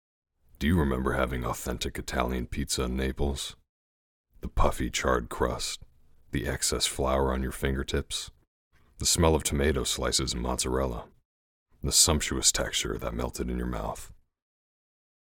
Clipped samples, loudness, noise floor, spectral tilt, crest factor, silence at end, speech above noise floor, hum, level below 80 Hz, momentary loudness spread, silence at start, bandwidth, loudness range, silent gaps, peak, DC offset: under 0.1%; -28 LUFS; under -90 dBFS; -3.5 dB/octave; 22 dB; 1.25 s; over 62 dB; none; -38 dBFS; 11 LU; 0.6 s; 18 kHz; 5 LU; 3.69-4.24 s, 8.47-8.71 s, 11.25-11.66 s; -6 dBFS; under 0.1%